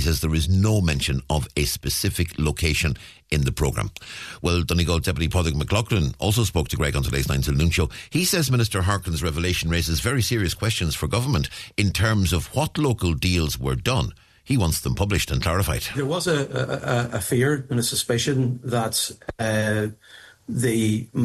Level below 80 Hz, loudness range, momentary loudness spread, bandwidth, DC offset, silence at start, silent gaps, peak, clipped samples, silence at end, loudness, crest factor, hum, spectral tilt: -34 dBFS; 2 LU; 5 LU; 14 kHz; under 0.1%; 0 s; none; -6 dBFS; under 0.1%; 0 s; -23 LUFS; 16 dB; none; -4.5 dB/octave